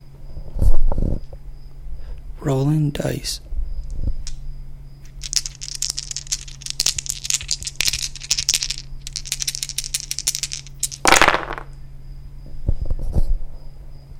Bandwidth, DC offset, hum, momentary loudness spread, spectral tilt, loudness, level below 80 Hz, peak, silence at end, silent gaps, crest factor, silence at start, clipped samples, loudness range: 17 kHz; under 0.1%; none; 22 LU; -2.5 dB/octave; -22 LUFS; -26 dBFS; 0 dBFS; 0 s; none; 20 dB; 0 s; under 0.1%; 6 LU